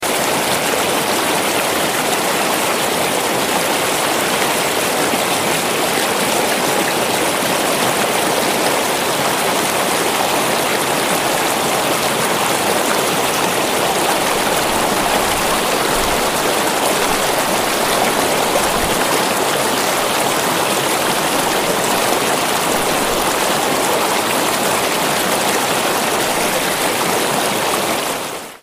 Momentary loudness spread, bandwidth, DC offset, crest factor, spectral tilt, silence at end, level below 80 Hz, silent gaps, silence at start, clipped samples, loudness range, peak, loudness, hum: 1 LU; 16 kHz; under 0.1%; 16 dB; -2 dB/octave; 0.05 s; -44 dBFS; none; 0 s; under 0.1%; 1 LU; -2 dBFS; -15 LUFS; none